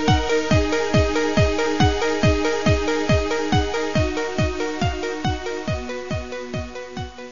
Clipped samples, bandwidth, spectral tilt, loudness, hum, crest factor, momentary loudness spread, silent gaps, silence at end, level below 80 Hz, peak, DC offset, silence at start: under 0.1%; 7.4 kHz; -5.5 dB/octave; -21 LUFS; none; 16 dB; 10 LU; none; 0 s; -32 dBFS; -4 dBFS; 2%; 0 s